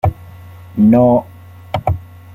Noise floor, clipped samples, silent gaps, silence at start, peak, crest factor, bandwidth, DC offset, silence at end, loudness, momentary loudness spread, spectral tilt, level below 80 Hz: -36 dBFS; under 0.1%; none; 0.05 s; -2 dBFS; 14 dB; 15 kHz; under 0.1%; 0.35 s; -14 LUFS; 16 LU; -10 dB/octave; -36 dBFS